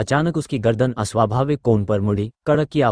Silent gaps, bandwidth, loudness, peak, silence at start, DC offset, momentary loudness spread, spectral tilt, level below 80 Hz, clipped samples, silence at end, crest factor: none; 10.5 kHz; -20 LUFS; -2 dBFS; 0 s; under 0.1%; 3 LU; -7 dB/octave; -46 dBFS; under 0.1%; 0 s; 16 dB